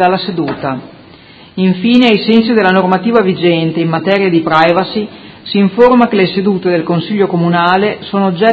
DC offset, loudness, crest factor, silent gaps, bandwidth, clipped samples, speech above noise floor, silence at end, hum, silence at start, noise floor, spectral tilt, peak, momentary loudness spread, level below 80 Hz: under 0.1%; -11 LUFS; 12 dB; none; 7.4 kHz; 0.3%; 27 dB; 0 s; none; 0 s; -38 dBFS; -8 dB/octave; 0 dBFS; 9 LU; -50 dBFS